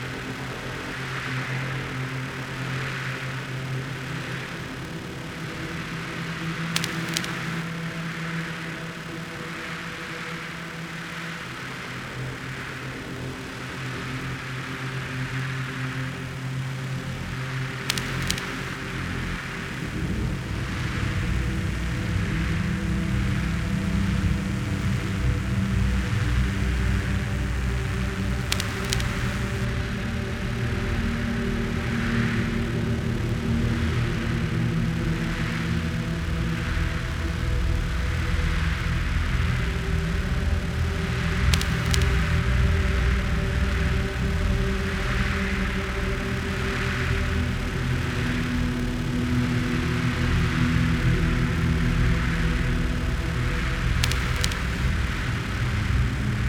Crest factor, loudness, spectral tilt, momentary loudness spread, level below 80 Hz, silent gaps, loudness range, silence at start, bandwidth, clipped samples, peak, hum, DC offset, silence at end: 26 dB; -27 LUFS; -5.5 dB/octave; 8 LU; -32 dBFS; none; 8 LU; 0 s; 18 kHz; under 0.1%; 0 dBFS; none; under 0.1%; 0 s